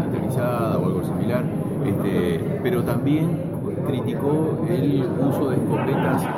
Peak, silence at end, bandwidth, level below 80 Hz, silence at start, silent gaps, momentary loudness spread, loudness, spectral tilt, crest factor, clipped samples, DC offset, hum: -8 dBFS; 0 s; 16.5 kHz; -50 dBFS; 0 s; none; 3 LU; -22 LUFS; -8 dB/octave; 14 dB; under 0.1%; under 0.1%; none